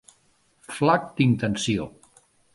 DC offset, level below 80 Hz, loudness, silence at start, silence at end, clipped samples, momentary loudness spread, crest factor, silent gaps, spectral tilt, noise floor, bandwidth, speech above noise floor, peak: under 0.1%; -56 dBFS; -23 LUFS; 0.7 s; 0.65 s; under 0.1%; 13 LU; 22 dB; none; -5.5 dB/octave; -64 dBFS; 11.5 kHz; 41 dB; -4 dBFS